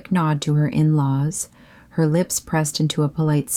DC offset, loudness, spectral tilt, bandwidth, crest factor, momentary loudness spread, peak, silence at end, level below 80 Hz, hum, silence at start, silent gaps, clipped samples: under 0.1%; -20 LUFS; -5.5 dB/octave; 16 kHz; 12 dB; 6 LU; -8 dBFS; 0 s; -52 dBFS; none; 0.1 s; none; under 0.1%